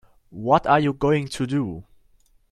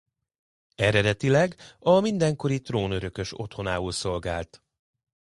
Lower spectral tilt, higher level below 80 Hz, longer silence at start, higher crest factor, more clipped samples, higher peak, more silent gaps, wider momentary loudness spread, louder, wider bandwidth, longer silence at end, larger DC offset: about the same, -6.5 dB/octave vs -5.5 dB/octave; about the same, -50 dBFS vs -48 dBFS; second, 0.35 s vs 0.8 s; about the same, 20 dB vs 20 dB; neither; about the same, -4 dBFS vs -6 dBFS; neither; first, 14 LU vs 11 LU; first, -22 LUFS vs -25 LUFS; about the same, 12.5 kHz vs 11.5 kHz; second, 0.7 s vs 0.85 s; neither